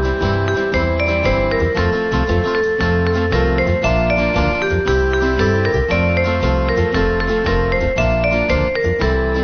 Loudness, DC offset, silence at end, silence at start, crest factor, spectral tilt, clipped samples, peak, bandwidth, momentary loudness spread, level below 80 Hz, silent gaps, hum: -17 LUFS; under 0.1%; 0 s; 0 s; 12 dB; -7 dB/octave; under 0.1%; -4 dBFS; 6.6 kHz; 2 LU; -22 dBFS; none; none